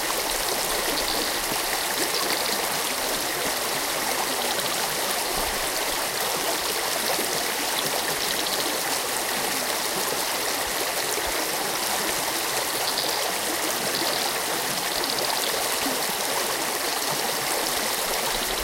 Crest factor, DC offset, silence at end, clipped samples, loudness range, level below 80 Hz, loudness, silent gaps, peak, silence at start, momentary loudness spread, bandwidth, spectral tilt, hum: 18 dB; under 0.1%; 0 s; under 0.1%; 0 LU; -50 dBFS; -24 LUFS; none; -6 dBFS; 0 s; 1 LU; 17 kHz; -0.5 dB/octave; none